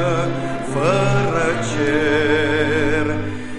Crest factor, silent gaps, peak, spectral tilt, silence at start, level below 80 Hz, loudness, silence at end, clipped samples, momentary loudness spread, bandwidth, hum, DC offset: 14 dB; none; -4 dBFS; -6 dB/octave; 0 s; -40 dBFS; -18 LUFS; 0 s; under 0.1%; 6 LU; 11.5 kHz; none; 3%